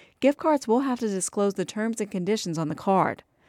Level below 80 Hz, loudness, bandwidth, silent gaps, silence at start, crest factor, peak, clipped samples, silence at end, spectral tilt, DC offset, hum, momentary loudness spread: -68 dBFS; -26 LUFS; 16 kHz; none; 0.2 s; 18 dB; -8 dBFS; under 0.1%; 0.35 s; -5 dB/octave; under 0.1%; none; 6 LU